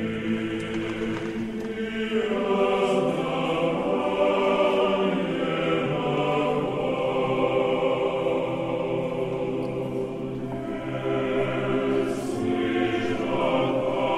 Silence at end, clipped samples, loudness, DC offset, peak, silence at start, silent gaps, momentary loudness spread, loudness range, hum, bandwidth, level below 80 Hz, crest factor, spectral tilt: 0 s; under 0.1%; -25 LUFS; under 0.1%; -10 dBFS; 0 s; none; 7 LU; 4 LU; none; 12.5 kHz; -52 dBFS; 16 dB; -6.5 dB/octave